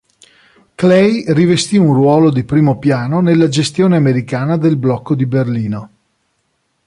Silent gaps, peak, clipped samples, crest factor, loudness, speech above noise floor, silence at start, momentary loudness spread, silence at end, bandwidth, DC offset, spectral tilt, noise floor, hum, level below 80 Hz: none; -2 dBFS; under 0.1%; 12 dB; -13 LUFS; 53 dB; 0.8 s; 6 LU; 1 s; 11.5 kHz; under 0.1%; -7 dB/octave; -64 dBFS; none; -50 dBFS